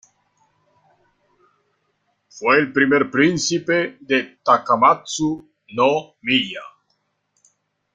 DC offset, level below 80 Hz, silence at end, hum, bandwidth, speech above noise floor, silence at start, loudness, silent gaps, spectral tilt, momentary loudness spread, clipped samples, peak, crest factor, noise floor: under 0.1%; -62 dBFS; 1.3 s; none; 9.4 kHz; 51 dB; 2.35 s; -18 LUFS; none; -4 dB/octave; 9 LU; under 0.1%; -2 dBFS; 20 dB; -70 dBFS